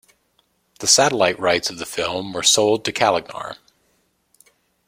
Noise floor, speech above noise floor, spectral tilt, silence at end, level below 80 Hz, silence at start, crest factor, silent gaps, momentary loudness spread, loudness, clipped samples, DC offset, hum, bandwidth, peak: -65 dBFS; 46 dB; -1.5 dB/octave; 1.35 s; -60 dBFS; 0.8 s; 20 dB; none; 12 LU; -18 LUFS; under 0.1%; under 0.1%; none; 16.5 kHz; -2 dBFS